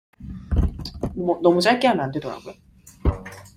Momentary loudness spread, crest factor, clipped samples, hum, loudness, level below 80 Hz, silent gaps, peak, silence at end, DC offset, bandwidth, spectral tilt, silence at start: 20 LU; 20 dB; under 0.1%; none; -22 LUFS; -32 dBFS; none; -4 dBFS; 0.1 s; under 0.1%; 15.5 kHz; -6 dB/octave; 0.2 s